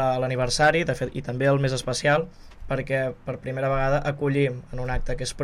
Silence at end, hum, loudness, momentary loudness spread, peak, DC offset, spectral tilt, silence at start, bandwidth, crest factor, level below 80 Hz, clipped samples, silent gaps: 0 s; none; -25 LUFS; 10 LU; -8 dBFS; under 0.1%; -5 dB/octave; 0 s; 12.5 kHz; 16 dB; -38 dBFS; under 0.1%; none